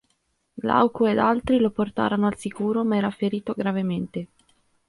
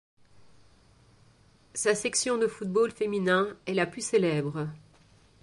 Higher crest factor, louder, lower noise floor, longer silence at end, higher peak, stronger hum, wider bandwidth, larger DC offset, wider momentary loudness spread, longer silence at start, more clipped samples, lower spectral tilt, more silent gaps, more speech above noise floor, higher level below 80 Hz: about the same, 18 dB vs 18 dB; first, -23 LUFS vs -28 LUFS; first, -71 dBFS vs -60 dBFS; about the same, 0.65 s vs 0.65 s; first, -6 dBFS vs -12 dBFS; neither; about the same, 11.5 kHz vs 11.5 kHz; neither; about the same, 9 LU vs 8 LU; first, 0.55 s vs 0.4 s; neither; first, -7 dB/octave vs -4 dB/octave; neither; first, 48 dB vs 33 dB; first, -54 dBFS vs -68 dBFS